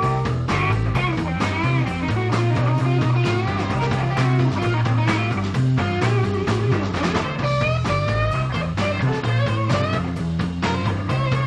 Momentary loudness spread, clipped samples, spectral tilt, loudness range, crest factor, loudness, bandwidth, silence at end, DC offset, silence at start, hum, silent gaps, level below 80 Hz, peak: 3 LU; under 0.1%; -7 dB/octave; 1 LU; 14 dB; -21 LUFS; 9.8 kHz; 0 s; under 0.1%; 0 s; none; none; -38 dBFS; -6 dBFS